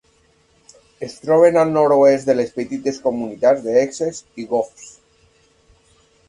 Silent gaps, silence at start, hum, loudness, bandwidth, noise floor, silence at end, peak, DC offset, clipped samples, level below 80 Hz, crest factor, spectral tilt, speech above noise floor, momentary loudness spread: none; 1 s; none; -17 LUFS; 11 kHz; -58 dBFS; 1.4 s; -2 dBFS; under 0.1%; under 0.1%; -60 dBFS; 18 dB; -6 dB/octave; 41 dB; 16 LU